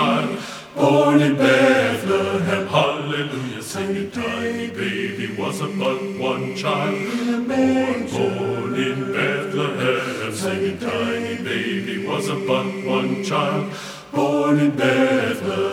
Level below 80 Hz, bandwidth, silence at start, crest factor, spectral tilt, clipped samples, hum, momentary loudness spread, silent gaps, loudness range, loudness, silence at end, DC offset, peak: -60 dBFS; 16 kHz; 0 s; 18 dB; -5.5 dB/octave; under 0.1%; none; 9 LU; none; 6 LU; -21 LUFS; 0 s; under 0.1%; -2 dBFS